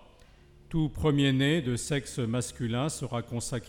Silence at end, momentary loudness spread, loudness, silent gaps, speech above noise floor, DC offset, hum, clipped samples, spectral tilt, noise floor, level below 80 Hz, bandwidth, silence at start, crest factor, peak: 0 s; 9 LU; -29 LUFS; none; 27 dB; under 0.1%; none; under 0.1%; -5.5 dB/octave; -56 dBFS; -48 dBFS; 16.5 kHz; 0.7 s; 16 dB; -12 dBFS